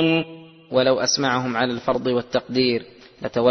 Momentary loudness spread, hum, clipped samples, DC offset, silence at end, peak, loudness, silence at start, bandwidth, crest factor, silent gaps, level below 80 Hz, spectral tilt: 9 LU; none; under 0.1%; under 0.1%; 0 s; -4 dBFS; -21 LUFS; 0 s; 6.4 kHz; 18 dB; none; -56 dBFS; -4 dB/octave